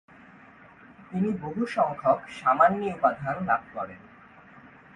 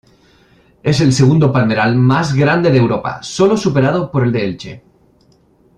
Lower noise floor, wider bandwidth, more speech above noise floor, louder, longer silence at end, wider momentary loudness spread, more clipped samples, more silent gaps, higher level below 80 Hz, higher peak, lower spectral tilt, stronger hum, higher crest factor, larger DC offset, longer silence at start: about the same, -52 dBFS vs -52 dBFS; about the same, 10 kHz vs 10 kHz; second, 26 dB vs 39 dB; second, -26 LUFS vs -13 LUFS; second, 0.3 s vs 1 s; first, 15 LU vs 11 LU; neither; neither; second, -64 dBFS vs -46 dBFS; second, -6 dBFS vs 0 dBFS; about the same, -7.5 dB/octave vs -6.5 dB/octave; neither; first, 22 dB vs 14 dB; neither; first, 1 s vs 0.85 s